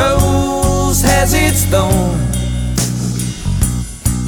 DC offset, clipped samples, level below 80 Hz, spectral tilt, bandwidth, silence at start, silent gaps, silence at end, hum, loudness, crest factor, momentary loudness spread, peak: under 0.1%; under 0.1%; -20 dBFS; -4.5 dB/octave; 19.5 kHz; 0 s; none; 0 s; none; -14 LUFS; 12 dB; 7 LU; -2 dBFS